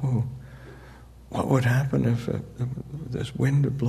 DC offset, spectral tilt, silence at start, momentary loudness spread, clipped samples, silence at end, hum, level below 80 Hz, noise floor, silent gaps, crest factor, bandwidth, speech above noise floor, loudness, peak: under 0.1%; -7.5 dB/octave; 0 s; 21 LU; under 0.1%; 0 s; none; -48 dBFS; -47 dBFS; none; 18 dB; 13.5 kHz; 22 dB; -26 LUFS; -8 dBFS